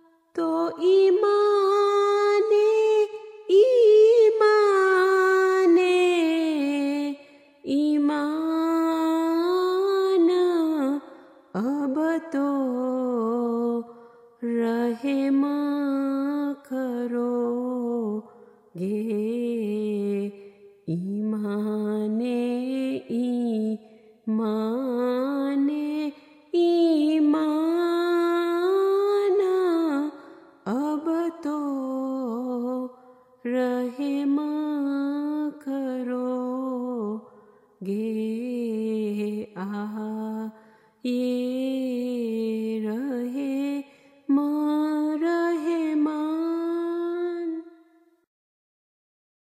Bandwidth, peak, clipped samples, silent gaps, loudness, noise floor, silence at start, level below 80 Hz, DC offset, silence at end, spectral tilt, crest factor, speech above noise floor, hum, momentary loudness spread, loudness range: 15 kHz; -8 dBFS; under 0.1%; none; -24 LUFS; -59 dBFS; 0.35 s; -78 dBFS; under 0.1%; 1.75 s; -6 dB/octave; 16 dB; 39 dB; none; 12 LU; 10 LU